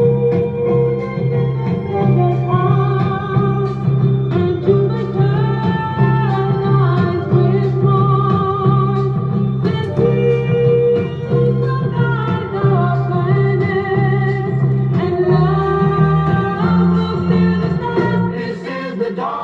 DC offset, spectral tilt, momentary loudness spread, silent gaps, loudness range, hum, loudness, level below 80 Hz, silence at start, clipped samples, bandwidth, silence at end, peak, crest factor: under 0.1%; -10 dB/octave; 4 LU; none; 1 LU; none; -16 LUFS; -42 dBFS; 0 s; under 0.1%; 4.7 kHz; 0 s; -2 dBFS; 14 dB